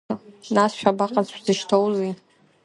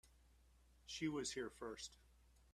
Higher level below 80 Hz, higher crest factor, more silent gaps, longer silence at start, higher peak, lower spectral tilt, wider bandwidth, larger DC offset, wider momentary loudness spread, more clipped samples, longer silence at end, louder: about the same, -68 dBFS vs -70 dBFS; about the same, 20 dB vs 20 dB; neither; about the same, 0.1 s vs 0.05 s; first, -2 dBFS vs -32 dBFS; first, -5 dB/octave vs -3.5 dB/octave; second, 11.5 kHz vs 14 kHz; neither; about the same, 12 LU vs 11 LU; neither; first, 0.5 s vs 0.05 s; first, -22 LUFS vs -48 LUFS